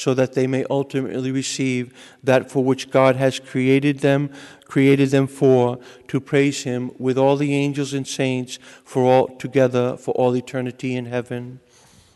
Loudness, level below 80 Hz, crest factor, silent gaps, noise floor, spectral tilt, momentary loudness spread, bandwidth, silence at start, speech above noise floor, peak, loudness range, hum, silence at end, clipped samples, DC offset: -20 LUFS; -64 dBFS; 16 dB; none; -52 dBFS; -6 dB/octave; 11 LU; 12 kHz; 0 s; 32 dB; -4 dBFS; 3 LU; none; 0.6 s; under 0.1%; under 0.1%